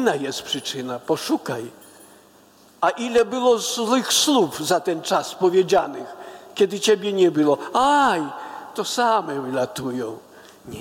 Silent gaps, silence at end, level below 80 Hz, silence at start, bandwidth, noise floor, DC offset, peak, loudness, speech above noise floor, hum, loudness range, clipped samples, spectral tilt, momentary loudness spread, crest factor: none; 0 s; -64 dBFS; 0 s; 17 kHz; -52 dBFS; under 0.1%; -6 dBFS; -21 LUFS; 31 dB; none; 4 LU; under 0.1%; -3 dB/octave; 15 LU; 16 dB